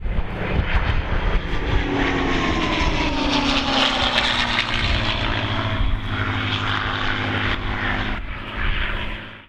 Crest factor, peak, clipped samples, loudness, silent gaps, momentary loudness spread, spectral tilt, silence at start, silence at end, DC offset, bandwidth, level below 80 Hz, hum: 18 dB; -4 dBFS; under 0.1%; -22 LUFS; none; 8 LU; -5 dB/octave; 0 s; 0.05 s; under 0.1%; 9.8 kHz; -26 dBFS; none